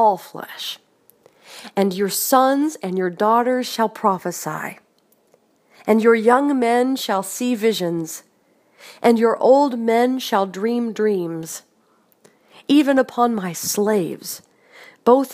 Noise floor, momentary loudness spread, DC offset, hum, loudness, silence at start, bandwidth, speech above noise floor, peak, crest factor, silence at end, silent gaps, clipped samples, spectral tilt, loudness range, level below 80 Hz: -60 dBFS; 15 LU; under 0.1%; none; -19 LUFS; 0 s; 15.5 kHz; 42 dB; 0 dBFS; 20 dB; 0 s; none; under 0.1%; -4.5 dB/octave; 2 LU; -74 dBFS